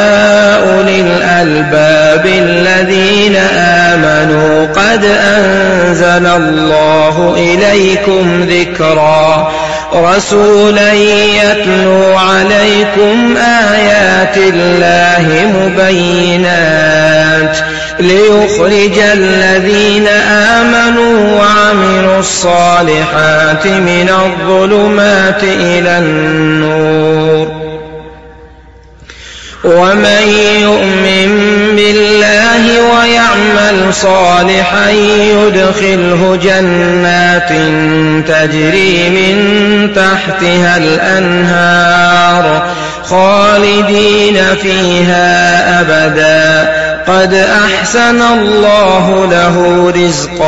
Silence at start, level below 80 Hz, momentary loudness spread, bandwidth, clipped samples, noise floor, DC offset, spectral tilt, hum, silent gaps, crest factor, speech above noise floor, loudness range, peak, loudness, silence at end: 0 s; -34 dBFS; 3 LU; 9.8 kHz; under 0.1%; -35 dBFS; 2%; -4.5 dB/octave; none; none; 8 dB; 28 dB; 2 LU; 0 dBFS; -7 LUFS; 0 s